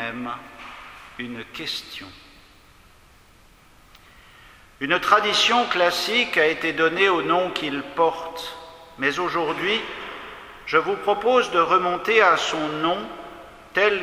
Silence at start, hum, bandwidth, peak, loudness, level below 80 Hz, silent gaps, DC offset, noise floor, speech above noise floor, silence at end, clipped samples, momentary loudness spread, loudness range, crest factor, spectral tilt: 0 s; none; 16 kHz; 0 dBFS; -21 LUFS; -56 dBFS; none; under 0.1%; -52 dBFS; 31 dB; 0 s; under 0.1%; 21 LU; 16 LU; 22 dB; -3 dB/octave